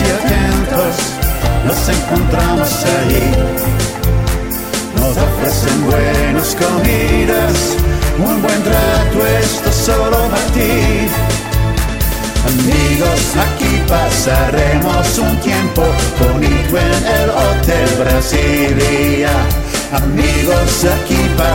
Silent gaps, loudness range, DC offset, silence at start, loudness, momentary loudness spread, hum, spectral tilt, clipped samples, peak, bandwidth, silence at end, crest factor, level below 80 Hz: none; 2 LU; under 0.1%; 0 s; -13 LUFS; 3 LU; none; -5 dB/octave; under 0.1%; 0 dBFS; 17 kHz; 0 s; 12 dB; -18 dBFS